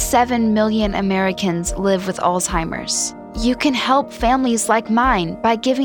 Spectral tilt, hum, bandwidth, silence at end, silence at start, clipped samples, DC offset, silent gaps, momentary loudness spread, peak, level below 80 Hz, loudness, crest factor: -4 dB/octave; none; over 20 kHz; 0 s; 0 s; under 0.1%; under 0.1%; none; 5 LU; -2 dBFS; -34 dBFS; -18 LUFS; 16 dB